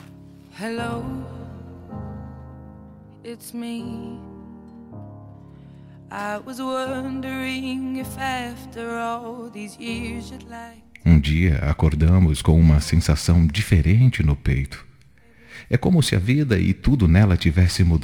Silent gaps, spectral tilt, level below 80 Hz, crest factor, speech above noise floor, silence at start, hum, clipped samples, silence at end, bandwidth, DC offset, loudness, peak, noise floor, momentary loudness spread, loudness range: none; -6.5 dB/octave; -32 dBFS; 18 dB; 33 dB; 0.2 s; none; under 0.1%; 0 s; 16 kHz; under 0.1%; -20 LUFS; -2 dBFS; -53 dBFS; 23 LU; 18 LU